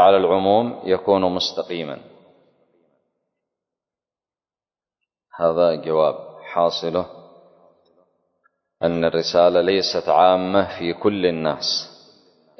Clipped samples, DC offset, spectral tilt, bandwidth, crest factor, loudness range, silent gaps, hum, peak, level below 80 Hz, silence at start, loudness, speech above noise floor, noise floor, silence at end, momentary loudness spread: under 0.1%; under 0.1%; -5 dB/octave; 6.4 kHz; 20 dB; 8 LU; none; none; -2 dBFS; -56 dBFS; 0 s; -19 LUFS; over 71 dB; under -90 dBFS; 0.7 s; 11 LU